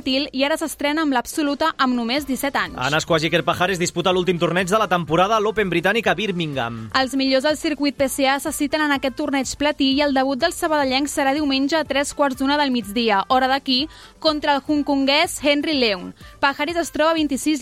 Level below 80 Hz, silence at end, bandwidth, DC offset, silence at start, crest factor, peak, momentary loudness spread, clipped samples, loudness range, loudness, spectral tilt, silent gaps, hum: -48 dBFS; 0 s; 16 kHz; under 0.1%; 0.05 s; 16 dB; -4 dBFS; 4 LU; under 0.1%; 1 LU; -20 LUFS; -4 dB/octave; none; none